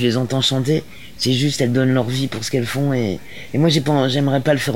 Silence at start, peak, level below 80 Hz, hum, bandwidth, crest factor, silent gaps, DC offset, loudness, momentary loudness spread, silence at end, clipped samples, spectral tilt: 0 s; -4 dBFS; -50 dBFS; none; 16.5 kHz; 14 dB; none; 1%; -18 LUFS; 6 LU; 0 s; under 0.1%; -5.5 dB/octave